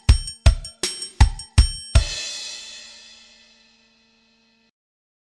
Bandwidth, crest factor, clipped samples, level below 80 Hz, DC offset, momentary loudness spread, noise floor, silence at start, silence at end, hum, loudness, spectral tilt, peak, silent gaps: 12.5 kHz; 20 dB; under 0.1%; -24 dBFS; under 0.1%; 19 LU; -61 dBFS; 0.1 s; 2.55 s; 50 Hz at -45 dBFS; -22 LUFS; -4 dB/octave; -2 dBFS; none